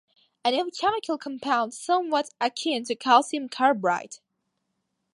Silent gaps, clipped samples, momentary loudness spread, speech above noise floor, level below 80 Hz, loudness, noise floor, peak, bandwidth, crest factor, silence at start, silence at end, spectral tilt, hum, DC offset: none; under 0.1%; 10 LU; 53 dB; -76 dBFS; -25 LUFS; -78 dBFS; -4 dBFS; 11.5 kHz; 22 dB; 0.45 s; 0.95 s; -3 dB/octave; none; under 0.1%